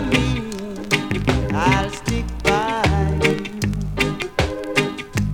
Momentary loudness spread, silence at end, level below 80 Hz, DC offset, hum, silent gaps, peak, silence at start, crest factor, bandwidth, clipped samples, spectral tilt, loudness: 6 LU; 0 s; -30 dBFS; under 0.1%; none; none; -2 dBFS; 0 s; 18 dB; 18.5 kHz; under 0.1%; -5.5 dB/octave; -21 LUFS